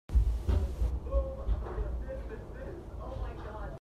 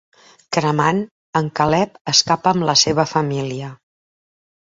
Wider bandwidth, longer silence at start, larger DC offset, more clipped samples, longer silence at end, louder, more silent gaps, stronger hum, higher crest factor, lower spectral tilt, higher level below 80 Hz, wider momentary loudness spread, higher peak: second, 6.4 kHz vs 7.8 kHz; second, 0.1 s vs 0.5 s; neither; neither; second, 0 s vs 0.95 s; second, -36 LUFS vs -17 LUFS; second, none vs 1.11-1.33 s, 2.01-2.05 s; neither; about the same, 18 dB vs 20 dB; first, -8.5 dB/octave vs -3.5 dB/octave; first, -34 dBFS vs -54 dBFS; about the same, 12 LU vs 10 LU; second, -16 dBFS vs 0 dBFS